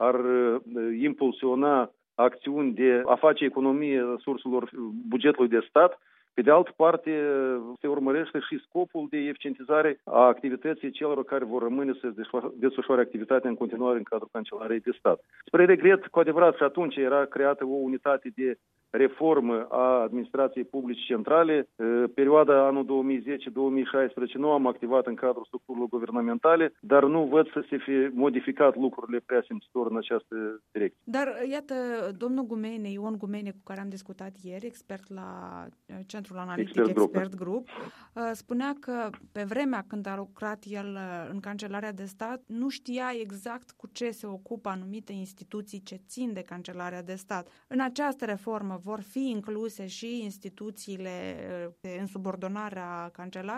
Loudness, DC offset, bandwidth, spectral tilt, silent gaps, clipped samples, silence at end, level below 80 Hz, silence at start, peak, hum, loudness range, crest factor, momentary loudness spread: -27 LUFS; under 0.1%; 13.5 kHz; -6.5 dB/octave; none; under 0.1%; 0 s; -80 dBFS; 0 s; -6 dBFS; none; 13 LU; 22 dB; 18 LU